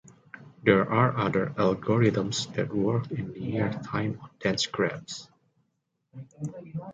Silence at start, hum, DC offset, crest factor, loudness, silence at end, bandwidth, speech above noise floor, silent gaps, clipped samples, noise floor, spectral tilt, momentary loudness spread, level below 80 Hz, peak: 0.35 s; none; under 0.1%; 22 dB; -27 LUFS; 0 s; 9.2 kHz; 50 dB; none; under 0.1%; -77 dBFS; -5.5 dB/octave; 15 LU; -60 dBFS; -6 dBFS